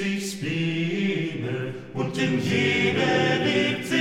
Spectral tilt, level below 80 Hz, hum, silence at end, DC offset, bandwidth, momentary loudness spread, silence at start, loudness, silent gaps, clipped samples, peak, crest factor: -5 dB/octave; -62 dBFS; none; 0 s; under 0.1%; 16 kHz; 8 LU; 0 s; -24 LUFS; none; under 0.1%; -10 dBFS; 16 dB